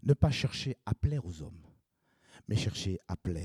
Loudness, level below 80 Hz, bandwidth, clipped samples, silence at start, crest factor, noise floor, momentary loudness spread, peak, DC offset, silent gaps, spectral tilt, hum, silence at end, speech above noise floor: -33 LUFS; -50 dBFS; 12 kHz; under 0.1%; 0.05 s; 22 dB; -73 dBFS; 17 LU; -12 dBFS; under 0.1%; none; -6 dB/octave; none; 0 s; 40 dB